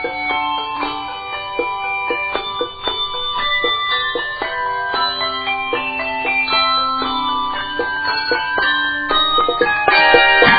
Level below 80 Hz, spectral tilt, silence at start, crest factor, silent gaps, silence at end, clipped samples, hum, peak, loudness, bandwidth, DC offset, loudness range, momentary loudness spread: -44 dBFS; 1 dB/octave; 0 s; 18 dB; none; 0 s; under 0.1%; none; 0 dBFS; -17 LUFS; 5.4 kHz; under 0.1%; 4 LU; 9 LU